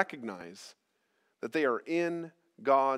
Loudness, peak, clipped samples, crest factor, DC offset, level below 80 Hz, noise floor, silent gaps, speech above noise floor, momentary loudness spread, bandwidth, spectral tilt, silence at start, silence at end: -32 LUFS; -10 dBFS; under 0.1%; 22 dB; under 0.1%; -88 dBFS; -76 dBFS; none; 45 dB; 19 LU; 13.5 kHz; -5.5 dB/octave; 0 s; 0 s